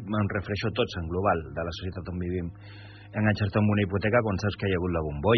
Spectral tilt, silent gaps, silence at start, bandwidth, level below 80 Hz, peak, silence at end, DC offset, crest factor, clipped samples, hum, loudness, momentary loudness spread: -5.5 dB/octave; none; 0 s; 6.2 kHz; -48 dBFS; -8 dBFS; 0 s; under 0.1%; 18 dB; under 0.1%; none; -28 LUFS; 11 LU